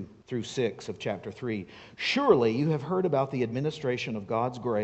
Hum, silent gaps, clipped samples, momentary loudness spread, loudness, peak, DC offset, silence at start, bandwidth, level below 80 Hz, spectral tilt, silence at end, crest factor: none; none; under 0.1%; 13 LU; -29 LUFS; -6 dBFS; under 0.1%; 0 s; 8.4 kHz; -64 dBFS; -6 dB/octave; 0 s; 22 dB